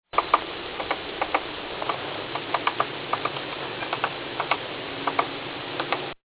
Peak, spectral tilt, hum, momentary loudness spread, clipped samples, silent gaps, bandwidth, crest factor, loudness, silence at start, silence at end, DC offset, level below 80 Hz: -2 dBFS; -1 dB/octave; none; 6 LU; under 0.1%; none; 4 kHz; 26 dB; -28 LUFS; 0.15 s; 0.1 s; under 0.1%; -58 dBFS